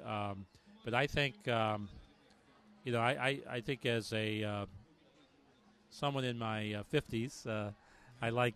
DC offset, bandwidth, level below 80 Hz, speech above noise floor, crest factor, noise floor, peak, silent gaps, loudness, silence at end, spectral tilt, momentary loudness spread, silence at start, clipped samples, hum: under 0.1%; 13 kHz; -64 dBFS; 30 dB; 22 dB; -67 dBFS; -16 dBFS; none; -37 LUFS; 0 s; -5.5 dB/octave; 14 LU; 0 s; under 0.1%; none